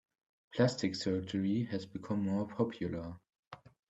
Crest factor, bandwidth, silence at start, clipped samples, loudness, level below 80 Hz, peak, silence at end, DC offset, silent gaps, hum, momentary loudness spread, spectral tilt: 20 dB; 8.4 kHz; 0.5 s; under 0.1%; -35 LUFS; -68 dBFS; -16 dBFS; 0.35 s; under 0.1%; 3.39-3.51 s; none; 22 LU; -6.5 dB/octave